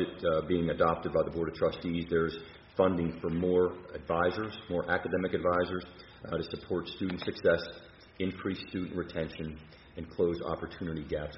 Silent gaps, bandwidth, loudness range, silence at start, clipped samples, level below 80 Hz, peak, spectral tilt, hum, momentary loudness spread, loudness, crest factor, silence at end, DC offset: none; 5.8 kHz; 5 LU; 0 s; under 0.1%; -54 dBFS; -12 dBFS; -5 dB/octave; none; 13 LU; -32 LUFS; 20 dB; 0 s; under 0.1%